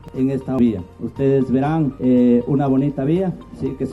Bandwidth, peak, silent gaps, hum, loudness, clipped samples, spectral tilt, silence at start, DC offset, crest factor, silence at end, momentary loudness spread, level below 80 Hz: 4.2 kHz; -6 dBFS; none; none; -19 LUFS; under 0.1%; -10 dB/octave; 0.05 s; under 0.1%; 12 dB; 0 s; 11 LU; -44 dBFS